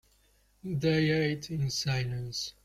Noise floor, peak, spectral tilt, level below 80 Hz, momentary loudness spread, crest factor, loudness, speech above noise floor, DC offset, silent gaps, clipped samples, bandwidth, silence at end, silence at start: -67 dBFS; -14 dBFS; -5 dB/octave; -56 dBFS; 10 LU; 16 dB; -30 LUFS; 36 dB; under 0.1%; none; under 0.1%; 15 kHz; 0.15 s; 0.65 s